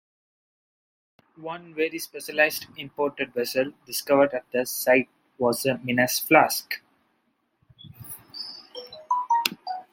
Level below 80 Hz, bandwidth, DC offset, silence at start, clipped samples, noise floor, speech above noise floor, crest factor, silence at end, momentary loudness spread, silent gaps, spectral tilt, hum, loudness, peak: -70 dBFS; 16.5 kHz; under 0.1%; 1.4 s; under 0.1%; -72 dBFS; 47 dB; 26 dB; 0.1 s; 18 LU; none; -3 dB/octave; none; -24 LUFS; 0 dBFS